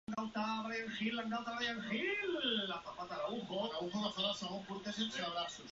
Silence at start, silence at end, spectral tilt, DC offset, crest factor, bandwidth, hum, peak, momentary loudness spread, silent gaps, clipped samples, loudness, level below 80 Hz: 0.1 s; 0 s; -2 dB/octave; under 0.1%; 16 dB; 7.6 kHz; none; -24 dBFS; 6 LU; none; under 0.1%; -39 LUFS; -74 dBFS